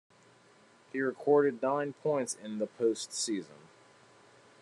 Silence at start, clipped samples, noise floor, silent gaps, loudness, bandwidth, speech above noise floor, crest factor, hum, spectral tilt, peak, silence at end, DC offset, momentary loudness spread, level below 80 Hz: 0.95 s; under 0.1%; -62 dBFS; none; -32 LUFS; 12 kHz; 30 dB; 20 dB; none; -4 dB/octave; -14 dBFS; 1.05 s; under 0.1%; 11 LU; -88 dBFS